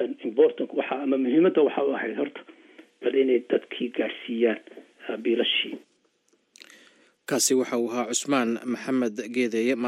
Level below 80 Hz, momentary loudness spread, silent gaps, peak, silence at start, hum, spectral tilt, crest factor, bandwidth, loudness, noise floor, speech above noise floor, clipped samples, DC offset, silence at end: -90 dBFS; 10 LU; none; -8 dBFS; 0 s; none; -3 dB/octave; 18 dB; 14 kHz; -25 LUFS; -68 dBFS; 43 dB; under 0.1%; under 0.1%; 0 s